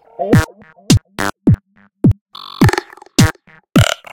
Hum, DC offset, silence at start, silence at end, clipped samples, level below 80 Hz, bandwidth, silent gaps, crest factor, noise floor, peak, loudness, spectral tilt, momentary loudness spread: none; under 0.1%; 0.2 s; 0.2 s; under 0.1%; -32 dBFS; 17.5 kHz; 2.21-2.26 s; 16 dB; -31 dBFS; 0 dBFS; -15 LUFS; -5.5 dB/octave; 8 LU